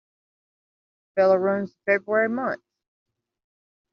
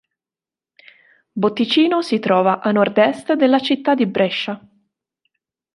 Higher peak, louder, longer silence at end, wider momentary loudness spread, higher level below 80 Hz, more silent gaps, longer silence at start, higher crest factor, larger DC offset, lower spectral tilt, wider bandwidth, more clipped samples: second, -6 dBFS vs -2 dBFS; second, -23 LUFS vs -17 LUFS; first, 1.35 s vs 1.15 s; first, 11 LU vs 7 LU; second, -74 dBFS vs -66 dBFS; neither; second, 1.15 s vs 1.35 s; about the same, 20 dB vs 16 dB; neither; about the same, -5.5 dB/octave vs -6 dB/octave; second, 6.4 kHz vs 11.5 kHz; neither